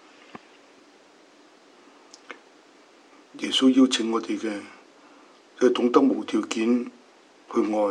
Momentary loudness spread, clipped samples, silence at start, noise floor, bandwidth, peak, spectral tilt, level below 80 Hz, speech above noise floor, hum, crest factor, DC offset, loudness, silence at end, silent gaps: 25 LU; under 0.1%; 0.35 s; -54 dBFS; 10.5 kHz; -4 dBFS; -3.5 dB/octave; -88 dBFS; 32 dB; none; 22 dB; under 0.1%; -23 LUFS; 0 s; none